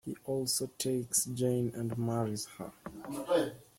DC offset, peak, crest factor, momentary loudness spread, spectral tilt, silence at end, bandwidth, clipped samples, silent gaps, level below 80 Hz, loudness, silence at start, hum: under 0.1%; -16 dBFS; 18 dB; 12 LU; -4.5 dB/octave; 0.15 s; 16.5 kHz; under 0.1%; none; -68 dBFS; -33 LUFS; 0.05 s; none